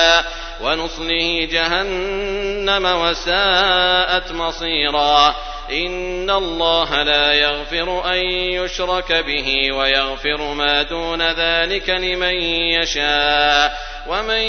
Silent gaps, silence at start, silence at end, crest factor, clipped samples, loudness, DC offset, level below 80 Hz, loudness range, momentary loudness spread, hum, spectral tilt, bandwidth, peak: none; 0 s; 0 s; 18 dB; under 0.1%; -17 LUFS; under 0.1%; -34 dBFS; 2 LU; 8 LU; none; -2.5 dB/octave; 6.6 kHz; 0 dBFS